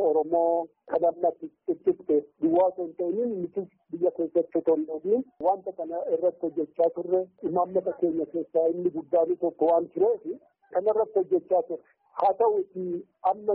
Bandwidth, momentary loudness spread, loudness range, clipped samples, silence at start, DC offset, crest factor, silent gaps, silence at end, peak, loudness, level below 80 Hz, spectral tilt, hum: 3.8 kHz; 9 LU; 2 LU; under 0.1%; 0 s; under 0.1%; 14 dB; none; 0 s; -12 dBFS; -27 LUFS; -72 dBFS; -5 dB/octave; none